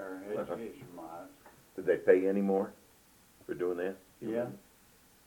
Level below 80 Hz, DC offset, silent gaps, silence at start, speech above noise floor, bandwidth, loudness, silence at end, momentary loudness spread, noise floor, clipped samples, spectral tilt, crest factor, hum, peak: -72 dBFS; under 0.1%; none; 0 s; 30 dB; 19 kHz; -33 LUFS; 0.65 s; 22 LU; -63 dBFS; under 0.1%; -7.5 dB/octave; 24 dB; none; -12 dBFS